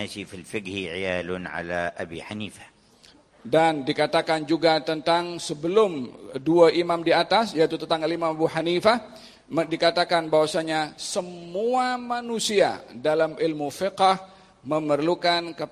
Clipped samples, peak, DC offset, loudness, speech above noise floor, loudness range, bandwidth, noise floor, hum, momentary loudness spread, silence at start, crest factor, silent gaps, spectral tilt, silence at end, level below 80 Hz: under 0.1%; -4 dBFS; under 0.1%; -24 LUFS; 31 dB; 5 LU; 15 kHz; -55 dBFS; none; 12 LU; 0 s; 20 dB; none; -4.5 dB/octave; 0.05 s; -60 dBFS